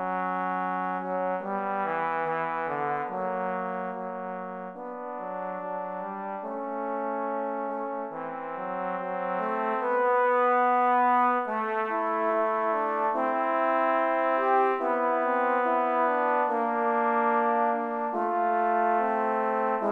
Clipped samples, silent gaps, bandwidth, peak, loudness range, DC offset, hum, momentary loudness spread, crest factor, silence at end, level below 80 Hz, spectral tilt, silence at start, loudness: under 0.1%; none; 5.4 kHz; -12 dBFS; 8 LU; under 0.1%; none; 11 LU; 14 dB; 0 s; -80 dBFS; -7.5 dB/octave; 0 s; -27 LUFS